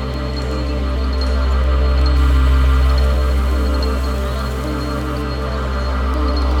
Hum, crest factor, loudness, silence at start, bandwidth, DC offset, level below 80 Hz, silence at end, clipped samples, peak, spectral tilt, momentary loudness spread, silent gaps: none; 10 dB; -18 LUFS; 0 s; 9.2 kHz; under 0.1%; -16 dBFS; 0 s; under 0.1%; -6 dBFS; -7 dB/octave; 7 LU; none